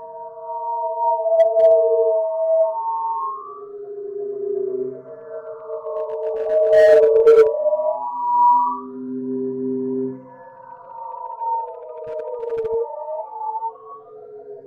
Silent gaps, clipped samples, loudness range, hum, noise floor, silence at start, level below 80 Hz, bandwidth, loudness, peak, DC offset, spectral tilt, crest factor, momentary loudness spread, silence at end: none; under 0.1%; 12 LU; none; -41 dBFS; 0 s; -64 dBFS; 7.2 kHz; -19 LUFS; -4 dBFS; under 0.1%; -6.5 dB/octave; 16 dB; 21 LU; 0 s